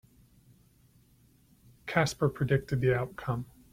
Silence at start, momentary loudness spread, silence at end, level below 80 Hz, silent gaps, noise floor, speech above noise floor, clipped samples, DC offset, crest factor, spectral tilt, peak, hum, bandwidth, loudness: 1.85 s; 8 LU; 0.25 s; -56 dBFS; none; -63 dBFS; 34 dB; under 0.1%; under 0.1%; 22 dB; -6 dB/octave; -10 dBFS; none; 16 kHz; -30 LUFS